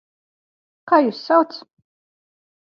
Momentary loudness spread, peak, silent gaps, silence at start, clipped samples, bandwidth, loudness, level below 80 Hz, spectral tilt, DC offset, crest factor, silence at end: 10 LU; -2 dBFS; none; 0.85 s; under 0.1%; 6.6 kHz; -18 LUFS; -80 dBFS; -6 dB/octave; under 0.1%; 20 dB; 1.1 s